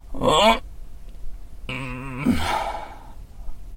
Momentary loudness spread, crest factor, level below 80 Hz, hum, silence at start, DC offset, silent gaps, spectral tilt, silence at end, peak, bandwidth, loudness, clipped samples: 27 LU; 20 dB; -36 dBFS; none; 0.05 s; under 0.1%; none; -4.5 dB/octave; 0 s; -4 dBFS; 16.5 kHz; -22 LUFS; under 0.1%